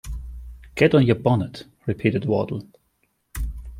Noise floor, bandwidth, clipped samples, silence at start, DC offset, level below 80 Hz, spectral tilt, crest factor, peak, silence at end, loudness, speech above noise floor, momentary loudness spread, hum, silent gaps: -69 dBFS; 16 kHz; under 0.1%; 0.05 s; under 0.1%; -38 dBFS; -7.5 dB/octave; 20 dB; -2 dBFS; 0 s; -22 LUFS; 48 dB; 19 LU; none; none